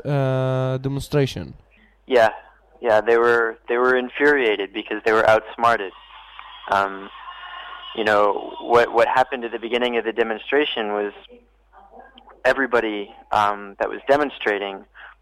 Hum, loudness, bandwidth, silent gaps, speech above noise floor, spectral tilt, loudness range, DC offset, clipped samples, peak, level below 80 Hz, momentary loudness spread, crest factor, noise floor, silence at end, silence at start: none; -20 LUFS; 14 kHz; none; 30 dB; -6 dB/octave; 5 LU; under 0.1%; under 0.1%; -6 dBFS; -52 dBFS; 17 LU; 16 dB; -50 dBFS; 0.1 s; 0.05 s